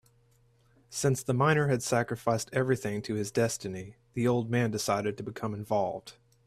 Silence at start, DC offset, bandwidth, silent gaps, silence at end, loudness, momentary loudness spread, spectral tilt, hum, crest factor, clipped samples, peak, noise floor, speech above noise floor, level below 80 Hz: 0.9 s; under 0.1%; 15 kHz; none; 0.35 s; -30 LUFS; 10 LU; -5.5 dB/octave; none; 18 dB; under 0.1%; -12 dBFS; -65 dBFS; 36 dB; -62 dBFS